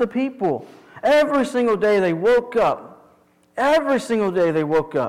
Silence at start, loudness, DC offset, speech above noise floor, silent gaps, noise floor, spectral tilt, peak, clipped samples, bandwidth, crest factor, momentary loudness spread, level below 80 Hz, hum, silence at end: 0 s; -19 LUFS; under 0.1%; 38 dB; none; -56 dBFS; -6 dB/octave; -12 dBFS; under 0.1%; 15 kHz; 8 dB; 7 LU; -54 dBFS; none; 0 s